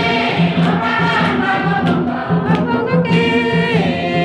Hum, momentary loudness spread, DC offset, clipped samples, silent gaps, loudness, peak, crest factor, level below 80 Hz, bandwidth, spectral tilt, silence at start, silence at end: none; 3 LU; under 0.1%; under 0.1%; none; -15 LUFS; -2 dBFS; 12 dB; -46 dBFS; 8.8 kHz; -7 dB/octave; 0 s; 0 s